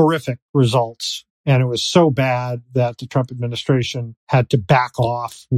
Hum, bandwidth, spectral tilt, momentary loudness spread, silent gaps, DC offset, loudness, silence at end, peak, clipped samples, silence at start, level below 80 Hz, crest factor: none; 13.5 kHz; -6 dB/octave; 9 LU; 0.42-0.54 s, 1.30-1.44 s, 4.17-4.27 s; under 0.1%; -19 LUFS; 0 s; 0 dBFS; under 0.1%; 0 s; -52 dBFS; 18 dB